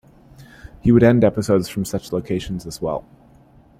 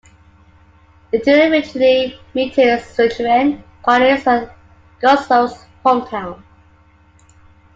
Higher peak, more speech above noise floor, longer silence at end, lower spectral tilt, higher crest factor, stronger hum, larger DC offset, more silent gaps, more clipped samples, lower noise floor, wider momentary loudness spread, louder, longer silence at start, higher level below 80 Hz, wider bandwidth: about the same, -2 dBFS vs -2 dBFS; about the same, 32 dB vs 35 dB; second, 0.8 s vs 1.4 s; first, -7 dB/octave vs -5 dB/octave; about the same, 18 dB vs 16 dB; neither; neither; neither; neither; about the same, -50 dBFS vs -50 dBFS; first, 13 LU vs 10 LU; second, -19 LUFS vs -15 LUFS; second, 0.4 s vs 1.15 s; first, -42 dBFS vs -50 dBFS; first, 15.5 kHz vs 7.8 kHz